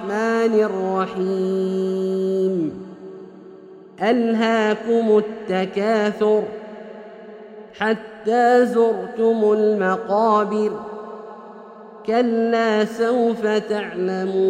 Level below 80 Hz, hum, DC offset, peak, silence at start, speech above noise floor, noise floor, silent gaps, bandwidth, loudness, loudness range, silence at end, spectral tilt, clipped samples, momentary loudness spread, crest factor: -66 dBFS; none; under 0.1%; -4 dBFS; 0 s; 23 dB; -42 dBFS; none; 9.8 kHz; -20 LUFS; 4 LU; 0 s; -6.5 dB/octave; under 0.1%; 21 LU; 16 dB